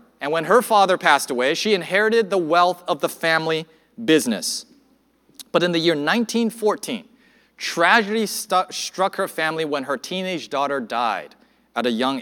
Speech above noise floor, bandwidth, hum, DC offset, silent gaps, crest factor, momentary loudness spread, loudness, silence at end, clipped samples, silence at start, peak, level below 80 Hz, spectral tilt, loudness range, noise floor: 40 dB; 19 kHz; none; under 0.1%; none; 20 dB; 10 LU; -20 LUFS; 0 s; under 0.1%; 0.2 s; 0 dBFS; -74 dBFS; -3.5 dB/octave; 5 LU; -60 dBFS